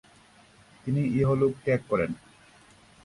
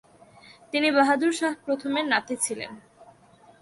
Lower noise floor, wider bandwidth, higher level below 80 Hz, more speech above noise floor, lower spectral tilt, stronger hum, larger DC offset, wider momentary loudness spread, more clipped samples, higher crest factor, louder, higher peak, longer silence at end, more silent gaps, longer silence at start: about the same, -57 dBFS vs -55 dBFS; about the same, 11.5 kHz vs 11.5 kHz; first, -56 dBFS vs -72 dBFS; about the same, 31 dB vs 30 dB; first, -9 dB/octave vs -2 dB/octave; neither; neither; first, 12 LU vs 9 LU; neither; about the same, 16 dB vs 20 dB; about the same, -27 LUFS vs -25 LUFS; second, -14 dBFS vs -8 dBFS; first, 0.9 s vs 0.55 s; neither; about the same, 0.85 s vs 0.75 s